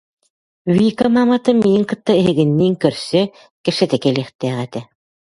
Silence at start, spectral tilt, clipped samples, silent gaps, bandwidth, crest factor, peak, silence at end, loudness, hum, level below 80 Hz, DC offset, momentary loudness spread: 0.65 s; -7 dB/octave; under 0.1%; 3.51-3.64 s, 4.35-4.39 s; 11.5 kHz; 16 dB; 0 dBFS; 0.55 s; -16 LUFS; none; -54 dBFS; under 0.1%; 10 LU